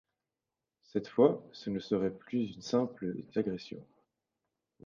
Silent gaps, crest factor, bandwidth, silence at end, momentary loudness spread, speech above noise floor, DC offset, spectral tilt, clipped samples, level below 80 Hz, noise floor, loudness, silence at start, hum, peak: none; 24 dB; 7.4 kHz; 1 s; 12 LU; 57 dB; under 0.1%; -7 dB/octave; under 0.1%; -70 dBFS; -90 dBFS; -33 LUFS; 0.95 s; none; -10 dBFS